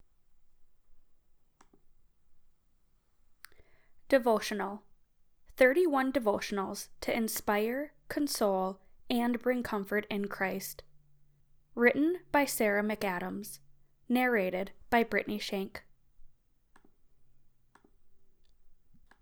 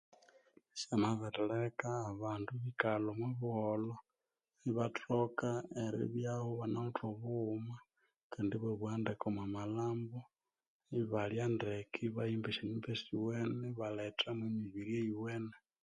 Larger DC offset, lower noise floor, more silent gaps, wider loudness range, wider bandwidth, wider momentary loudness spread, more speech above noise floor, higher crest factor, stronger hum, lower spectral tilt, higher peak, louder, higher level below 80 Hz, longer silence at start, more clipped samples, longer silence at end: neither; second, -67 dBFS vs under -90 dBFS; second, none vs 8.16-8.30 s, 10.68-10.80 s; first, 6 LU vs 2 LU; first, over 20 kHz vs 9.8 kHz; first, 13 LU vs 7 LU; second, 37 dB vs over 51 dB; about the same, 22 dB vs 24 dB; neither; second, -4 dB/octave vs -6.5 dB/octave; first, -12 dBFS vs -16 dBFS; first, -31 LUFS vs -40 LUFS; first, -62 dBFS vs -72 dBFS; second, 0.5 s vs 0.75 s; neither; first, 0.5 s vs 0.25 s